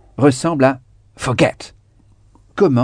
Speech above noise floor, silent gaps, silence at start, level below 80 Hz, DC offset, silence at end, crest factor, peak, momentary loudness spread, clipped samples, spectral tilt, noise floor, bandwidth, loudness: 35 dB; none; 0.2 s; -48 dBFS; under 0.1%; 0 s; 18 dB; 0 dBFS; 18 LU; under 0.1%; -6 dB/octave; -51 dBFS; 10 kHz; -17 LUFS